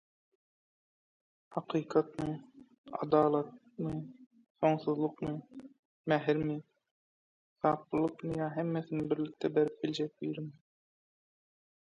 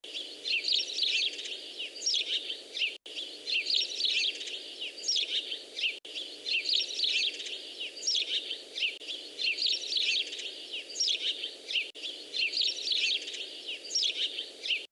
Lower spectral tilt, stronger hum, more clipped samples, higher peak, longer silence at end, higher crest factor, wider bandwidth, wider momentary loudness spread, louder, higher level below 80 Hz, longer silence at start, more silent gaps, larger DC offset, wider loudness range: first, -8 dB/octave vs 3 dB/octave; neither; neither; about the same, -14 dBFS vs -16 dBFS; first, 1.45 s vs 0.05 s; about the same, 22 dB vs 18 dB; second, 7.8 kHz vs 12 kHz; first, 14 LU vs 11 LU; second, -34 LUFS vs -30 LUFS; first, -68 dBFS vs under -90 dBFS; first, 1.5 s vs 0.05 s; first, 2.78-2.84 s, 4.26-4.31 s, 4.50-4.55 s, 5.79-6.04 s, 6.91-7.56 s vs none; neither; about the same, 2 LU vs 0 LU